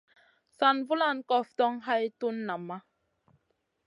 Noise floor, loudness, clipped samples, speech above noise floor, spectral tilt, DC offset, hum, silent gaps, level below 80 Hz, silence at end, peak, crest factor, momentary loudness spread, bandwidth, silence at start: -77 dBFS; -29 LUFS; under 0.1%; 48 dB; -6 dB/octave; under 0.1%; none; none; -84 dBFS; 1.05 s; -10 dBFS; 22 dB; 11 LU; 11.5 kHz; 0.6 s